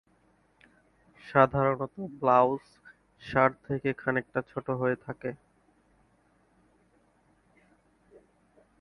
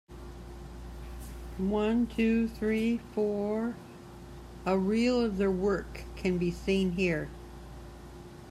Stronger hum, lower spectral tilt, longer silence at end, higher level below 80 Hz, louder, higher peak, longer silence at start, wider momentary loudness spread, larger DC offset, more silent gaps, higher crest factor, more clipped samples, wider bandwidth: neither; first, -8.5 dB/octave vs -7 dB/octave; first, 3.45 s vs 0 s; second, -62 dBFS vs -46 dBFS; about the same, -28 LUFS vs -30 LUFS; first, -4 dBFS vs -16 dBFS; first, 1.25 s vs 0.1 s; second, 15 LU vs 20 LU; neither; neither; first, 26 dB vs 16 dB; neither; second, 10.5 kHz vs 14 kHz